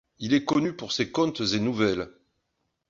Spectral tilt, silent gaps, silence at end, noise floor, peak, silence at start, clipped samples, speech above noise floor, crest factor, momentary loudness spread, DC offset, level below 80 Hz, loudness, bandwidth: -5 dB/octave; none; 0.8 s; -78 dBFS; -10 dBFS; 0.2 s; under 0.1%; 52 dB; 16 dB; 5 LU; under 0.1%; -58 dBFS; -26 LUFS; 7.6 kHz